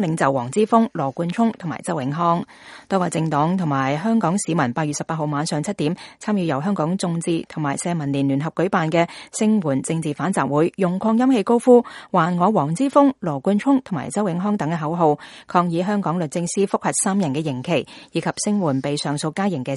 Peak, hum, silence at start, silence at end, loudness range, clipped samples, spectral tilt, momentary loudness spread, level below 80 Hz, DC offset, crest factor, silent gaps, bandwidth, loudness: -2 dBFS; none; 0 s; 0 s; 4 LU; under 0.1%; -6 dB/octave; 7 LU; -62 dBFS; under 0.1%; 18 dB; none; 11.5 kHz; -21 LUFS